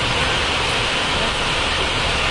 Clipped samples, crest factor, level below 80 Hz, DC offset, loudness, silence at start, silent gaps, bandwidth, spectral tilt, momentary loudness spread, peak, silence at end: under 0.1%; 12 dB; -32 dBFS; under 0.1%; -18 LUFS; 0 s; none; 11.5 kHz; -2.5 dB/octave; 1 LU; -6 dBFS; 0 s